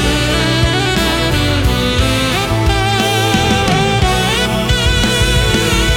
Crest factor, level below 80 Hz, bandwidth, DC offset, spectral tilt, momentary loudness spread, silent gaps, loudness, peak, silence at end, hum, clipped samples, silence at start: 12 dB; -20 dBFS; 18 kHz; under 0.1%; -4 dB/octave; 2 LU; none; -13 LUFS; 0 dBFS; 0 s; none; under 0.1%; 0 s